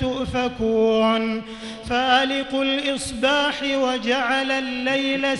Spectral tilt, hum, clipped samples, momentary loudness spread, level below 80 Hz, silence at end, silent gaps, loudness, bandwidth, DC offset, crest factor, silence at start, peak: -4 dB/octave; none; under 0.1%; 7 LU; -46 dBFS; 0 s; none; -21 LUFS; 12 kHz; under 0.1%; 16 dB; 0 s; -6 dBFS